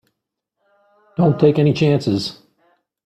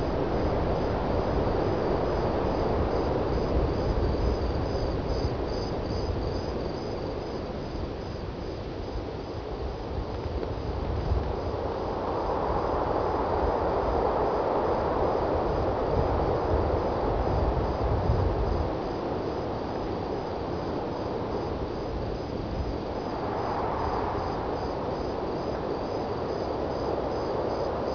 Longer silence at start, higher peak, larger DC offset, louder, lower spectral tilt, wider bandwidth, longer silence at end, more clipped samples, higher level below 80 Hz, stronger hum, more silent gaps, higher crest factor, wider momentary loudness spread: first, 1.2 s vs 0 s; first, -2 dBFS vs -12 dBFS; second, under 0.1% vs 0.2%; first, -17 LUFS vs -29 LUFS; about the same, -7.5 dB/octave vs -8 dB/octave; first, 9 kHz vs 5.4 kHz; first, 0.7 s vs 0 s; neither; second, -56 dBFS vs -36 dBFS; neither; neither; about the same, 18 dB vs 16 dB; first, 12 LU vs 7 LU